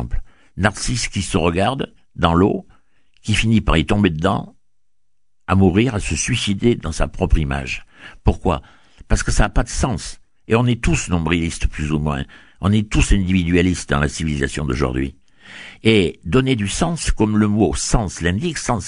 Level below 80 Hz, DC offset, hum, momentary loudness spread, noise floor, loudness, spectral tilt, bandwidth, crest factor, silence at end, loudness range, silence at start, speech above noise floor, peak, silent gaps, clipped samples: -26 dBFS; 0.3%; none; 11 LU; -76 dBFS; -19 LUFS; -5 dB/octave; 11 kHz; 18 dB; 0 s; 3 LU; 0 s; 58 dB; 0 dBFS; none; under 0.1%